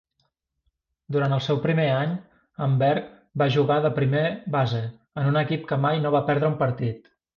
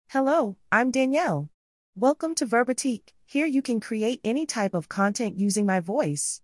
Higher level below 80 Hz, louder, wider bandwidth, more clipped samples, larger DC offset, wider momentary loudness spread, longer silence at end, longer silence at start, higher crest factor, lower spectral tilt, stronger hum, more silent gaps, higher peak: first, -60 dBFS vs -70 dBFS; about the same, -24 LUFS vs -25 LUFS; second, 6.8 kHz vs 12 kHz; neither; neither; first, 8 LU vs 5 LU; first, 0.4 s vs 0.05 s; first, 1.1 s vs 0.1 s; about the same, 14 dB vs 18 dB; first, -8.5 dB/octave vs -4.5 dB/octave; neither; second, none vs 1.54-1.93 s; about the same, -10 dBFS vs -8 dBFS